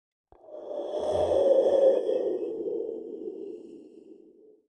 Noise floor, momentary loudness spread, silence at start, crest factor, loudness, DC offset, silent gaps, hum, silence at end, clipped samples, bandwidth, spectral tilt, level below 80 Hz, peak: -56 dBFS; 21 LU; 0.5 s; 18 dB; -26 LUFS; under 0.1%; none; none; 0.55 s; under 0.1%; 9.4 kHz; -6.5 dB/octave; -64 dBFS; -10 dBFS